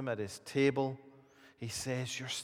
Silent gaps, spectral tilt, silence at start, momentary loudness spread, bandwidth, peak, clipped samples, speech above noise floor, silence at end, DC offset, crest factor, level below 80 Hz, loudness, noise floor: none; -4.5 dB/octave; 0 s; 12 LU; 16.5 kHz; -18 dBFS; under 0.1%; 26 dB; 0 s; under 0.1%; 20 dB; -72 dBFS; -35 LUFS; -61 dBFS